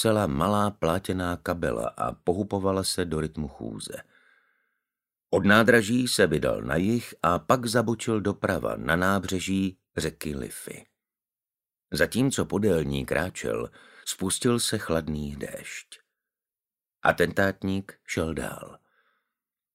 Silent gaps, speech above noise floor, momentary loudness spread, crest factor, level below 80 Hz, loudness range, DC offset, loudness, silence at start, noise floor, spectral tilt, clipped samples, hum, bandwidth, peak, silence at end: none; over 64 dB; 14 LU; 24 dB; -50 dBFS; 7 LU; under 0.1%; -26 LUFS; 0 s; under -90 dBFS; -4.5 dB/octave; under 0.1%; none; 16 kHz; -4 dBFS; 1 s